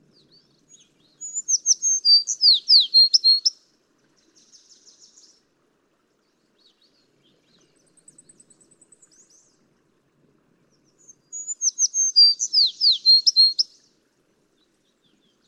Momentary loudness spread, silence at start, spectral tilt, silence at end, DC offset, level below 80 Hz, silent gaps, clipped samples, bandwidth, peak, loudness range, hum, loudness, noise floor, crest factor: 16 LU; 1.2 s; 4.5 dB/octave; 1.85 s; under 0.1%; -84 dBFS; none; under 0.1%; 11.5 kHz; -4 dBFS; 10 LU; none; -15 LUFS; -67 dBFS; 20 dB